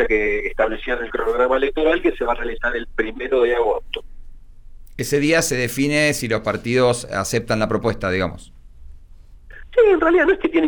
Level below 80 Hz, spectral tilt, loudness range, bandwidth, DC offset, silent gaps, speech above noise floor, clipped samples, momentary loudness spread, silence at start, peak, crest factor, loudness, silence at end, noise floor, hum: -36 dBFS; -4.5 dB/octave; 3 LU; over 20 kHz; under 0.1%; none; 23 dB; under 0.1%; 9 LU; 0 s; -6 dBFS; 14 dB; -19 LUFS; 0 s; -42 dBFS; none